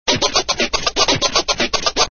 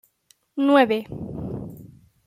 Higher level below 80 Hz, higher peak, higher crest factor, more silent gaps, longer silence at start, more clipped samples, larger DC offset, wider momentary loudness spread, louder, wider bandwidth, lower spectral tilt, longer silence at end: first, -36 dBFS vs -52 dBFS; about the same, -2 dBFS vs -4 dBFS; about the same, 16 dB vs 20 dB; neither; second, 0.05 s vs 0.55 s; neither; neither; second, 3 LU vs 18 LU; first, -16 LUFS vs -22 LUFS; second, 7 kHz vs 15 kHz; second, -1.5 dB/octave vs -7 dB/octave; second, 0 s vs 0.4 s